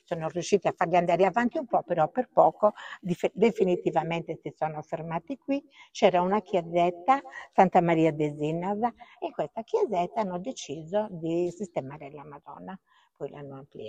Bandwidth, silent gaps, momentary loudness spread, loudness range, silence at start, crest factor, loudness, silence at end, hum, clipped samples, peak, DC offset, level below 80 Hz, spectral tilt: 9.2 kHz; none; 18 LU; 6 LU; 0.1 s; 22 dB; -27 LUFS; 0 s; none; under 0.1%; -6 dBFS; under 0.1%; -68 dBFS; -6.5 dB/octave